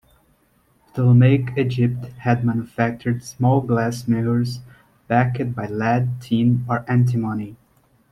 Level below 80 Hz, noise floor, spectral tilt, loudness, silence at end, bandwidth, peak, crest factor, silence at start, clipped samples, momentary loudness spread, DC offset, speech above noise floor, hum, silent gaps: -54 dBFS; -61 dBFS; -8 dB/octave; -20 LUFS; 0.55 s; 11.5 kHz; -4 dBFS; 16 dB; 0.95 s; under 0.1%; 9 LU; under 0.1%; 42 dB; none; none